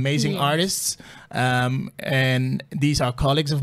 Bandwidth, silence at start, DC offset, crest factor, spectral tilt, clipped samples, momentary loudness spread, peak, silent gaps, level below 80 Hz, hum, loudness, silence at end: 15 kHz; 0 s; under 0.1%; 14 dB; -4.5 dB/octave; under 0.1%; 6 LU; -8 dBFS; none; -42 dBFS; none; -22 LUFS; 0 s